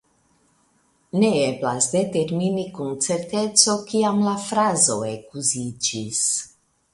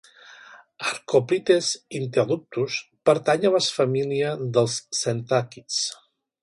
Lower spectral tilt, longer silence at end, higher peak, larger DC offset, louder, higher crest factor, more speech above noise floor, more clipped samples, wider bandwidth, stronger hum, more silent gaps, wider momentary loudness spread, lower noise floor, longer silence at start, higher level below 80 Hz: about the same, -3.5 dB/octave vs -4 dB/octave; about the same, 0.45 s vs 0.5 s; first, -2 dBFS vs -6 dBFS; neither; about the same, -21 LUFS vs -23 LUFS; about the same, 22 dB vs 18 dB; first, 42 dB vs 25 dB; neither; about the same, 11.5 kHz vs 11.5 kHz; neither; neither; about the same, 10 LU vs 8 LU; first, -63 dBFS vs -48 dBFS; first, 1.15 s vs 0.3 s; first, -62 dBFS vs -68 dBFS